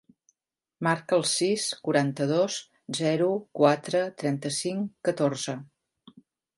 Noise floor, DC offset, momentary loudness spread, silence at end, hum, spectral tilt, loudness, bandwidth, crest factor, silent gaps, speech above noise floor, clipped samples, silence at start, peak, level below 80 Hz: -85 dBFS; under 0.1%; 8 LU; 0.9 s; none; -4.5 dB/octave; -27 LUFS; 11.5 kHz; 20 dB; none; 59 dB; under 0.1%; 0.8 s; -6 dBFS; -76 dBFS